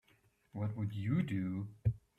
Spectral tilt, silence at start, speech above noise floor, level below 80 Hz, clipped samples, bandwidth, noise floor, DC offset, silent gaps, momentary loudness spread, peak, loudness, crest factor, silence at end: -9 dB/octave; 0.55 s; 35 dB; -58 dBFS; under 0.1%; 8.2 kHz; -72 dBFS; under 0.1%; none; 7 LU; -22 dBFS; -38 LUFS; 16 dB; 0.2 s